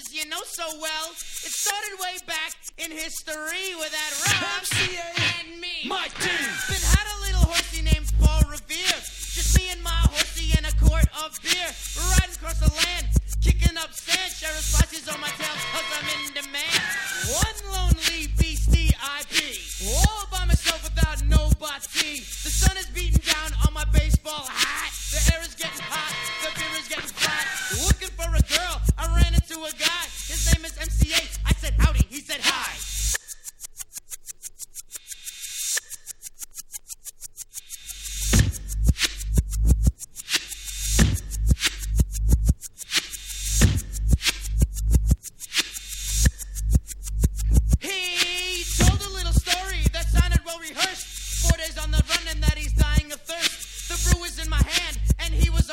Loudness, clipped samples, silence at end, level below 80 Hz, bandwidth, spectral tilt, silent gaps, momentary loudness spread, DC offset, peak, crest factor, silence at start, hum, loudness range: -24 LUFS; under 0.1%; 0 s; -26 dBFS; 17 kHz; -3 dB/octave; none; 10 LU; under 0.1%; -4 dBFS; 20 dB; 0 s; none; 5 LU